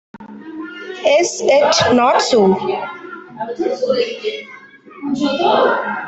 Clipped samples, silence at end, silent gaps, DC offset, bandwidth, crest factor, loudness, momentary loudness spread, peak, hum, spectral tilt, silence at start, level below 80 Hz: under 0.1%; 0 s; none; under 0.1%; 8.4 kHz; 14 dB; -15 LUFS; 18 LU; -2 dBFS; none; -3.5 dB/octave; 0.15 s; -60 dBFS